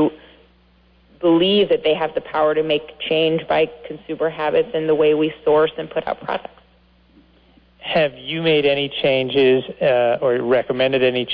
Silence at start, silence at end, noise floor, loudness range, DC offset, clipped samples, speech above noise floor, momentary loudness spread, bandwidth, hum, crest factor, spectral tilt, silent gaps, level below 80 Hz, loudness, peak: 0 s; 0 s; -54 dBFS; 4 LU; under 0.1%; under 0.1%; 36 dB; 9 LU; 5.2 kHz; 60 Hz at -55 dBFS; 14 dB; -8.5 dB/octave; none; -54 dBFS; -18 LUFS; -6 dBFS